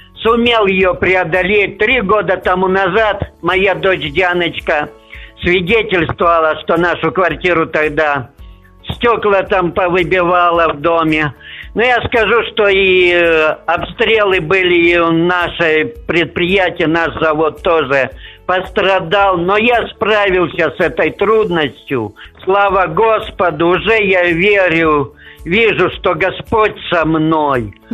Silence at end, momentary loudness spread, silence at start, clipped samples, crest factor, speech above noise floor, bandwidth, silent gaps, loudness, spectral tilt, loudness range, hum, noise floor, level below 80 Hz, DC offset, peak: 0.2 s; 6 LU; 0.15 s; under 0.1%; 12 dB; 24 dB; 13 kHz; none; -12 LUFS; -6.5 dB/octave; 3 LU; none; -37 dBFS; -36 dBFS; under 0.1%; 0 dBFS